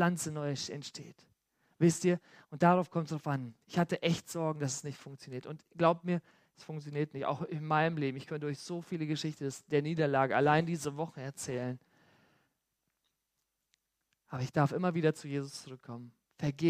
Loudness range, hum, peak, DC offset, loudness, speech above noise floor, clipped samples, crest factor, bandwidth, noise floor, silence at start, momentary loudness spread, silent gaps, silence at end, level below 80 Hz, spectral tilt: 6 LU; none; -12 dBFS; under 0.1%; -33 LUFS; 51 dB; under 0.1%; 22 dB; 15 kHz; -84 dBFS; 0 s; 17 LU; none; 0 s; -74 dBFS; -6 dB/octave